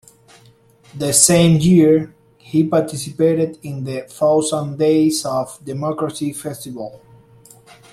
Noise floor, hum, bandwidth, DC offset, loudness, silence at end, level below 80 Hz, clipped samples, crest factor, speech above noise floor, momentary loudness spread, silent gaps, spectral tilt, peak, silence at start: -50 dBFS; none; 15.5 kHz; under 0.1%; -16 LUFS; 0.95 s; -52 dBFS; under 0.1%; 18 dB; 34 dB; 16 LU; none; -5 dB/octave; 0 dBFS; 0.95 s